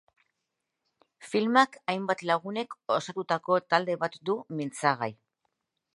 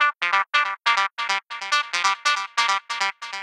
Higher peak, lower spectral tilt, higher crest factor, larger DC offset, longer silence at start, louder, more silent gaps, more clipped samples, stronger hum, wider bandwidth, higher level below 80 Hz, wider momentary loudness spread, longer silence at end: second, -8 dBFS vs -4 dBFS; first, -5 dB/octave vs 2.5 dB/octave; about the same, 22 dB vs 18 dB; neither; first, 1.2 s vs 0 s; second, -28 LUFS vs -22 LUFS; neither; neither; neither; second, 11.5 kHz vs 14 kHz; first, -80 dBFS vs under -90 dBFS; first, 9 LU vs 5 LU; first, 0.8 s vs 0 s